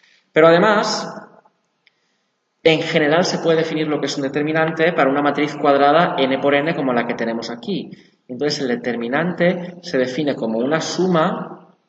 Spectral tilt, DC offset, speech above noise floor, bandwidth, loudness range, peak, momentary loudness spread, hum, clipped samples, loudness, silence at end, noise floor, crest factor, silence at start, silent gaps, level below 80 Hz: -5 dB/octave; under 0.1%; 51 dB; 8.2 kHz; 5 LU; 0 dBFS; 12 LU; none; under 0.1%; -18 LUFS; 0.3 s; -69 dBFS; 18 dB; 0.35 s; none; -68 dBFS